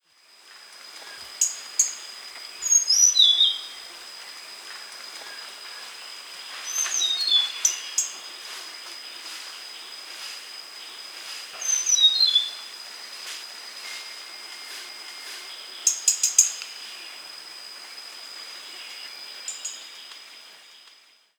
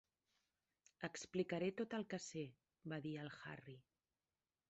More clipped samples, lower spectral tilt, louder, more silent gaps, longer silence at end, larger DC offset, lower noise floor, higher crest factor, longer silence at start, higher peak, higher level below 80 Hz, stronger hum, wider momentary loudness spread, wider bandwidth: neither; second, 5.5 dB/octave vs -5 dB/octave; first, -20 LUFS vs -48 LUFS; neither; second, 0.5 s vs 0.9 s; neither; second, -56 dBFS vs under -90 dBFS; first, 28 dB vs 22 dB; second, 0.45 s vs 1 s; first, 0 dBFS vs -28 dBFS; about the same, -84 dBFS vs -84 dBFS; neither; first, 21 LU vs 14 LU; first, over 20 kHz vs 8 kHz